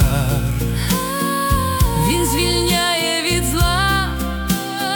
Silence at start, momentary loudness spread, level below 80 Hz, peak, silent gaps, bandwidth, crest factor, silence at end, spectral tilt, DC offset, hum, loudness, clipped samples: 0 s; 5 LU; -24 dBFS; -2 dBFS; none; 19 kHz; 16 dB; 0 s; -4 dB/octave; under 0.1%; none; -18 LUFS; under 0.1%